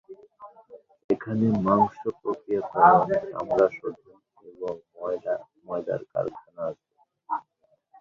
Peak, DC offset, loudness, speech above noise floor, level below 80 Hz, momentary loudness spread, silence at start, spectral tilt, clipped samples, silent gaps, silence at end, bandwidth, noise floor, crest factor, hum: -4 dBFS; under 0.1%; -26 LUFS; 47 dB; -64 dBFS; 16 LU; 0.1 s; -9.5 dB/octave; under 0.1%; 1.04-1.09 s; 0.6 s; 7 kHz; -69 dBFS; 22 dB; none